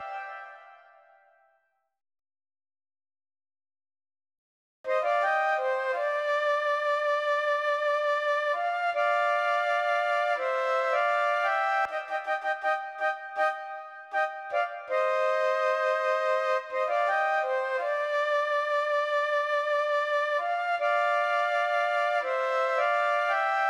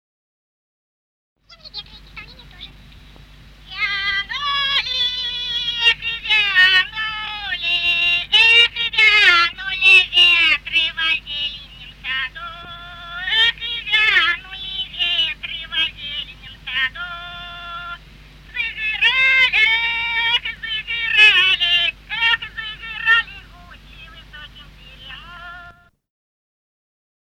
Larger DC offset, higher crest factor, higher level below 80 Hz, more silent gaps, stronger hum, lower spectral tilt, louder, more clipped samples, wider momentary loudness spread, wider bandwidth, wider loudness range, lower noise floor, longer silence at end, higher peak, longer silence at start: neither; second, 12 dB vs 20 dB; second, -84 dBFS vs -46 dBFS; first, 4.38-4.84 s vs none; neither; about the same, 0.5 dB/octave vs -0.5 dB/octave; second, -27 LUFS vs -15 LUFS; neither; second, 5 LU vs 22 LU; second, 12 kHz vs 16 kHz; second, 4 LU vs 12 LU; first, -73 dBFS vs -45 dBFS; second, 0 s vs 1.6 s; second, -16 dBFS vs 0 dBFS; second, 0 s vs 1.65 s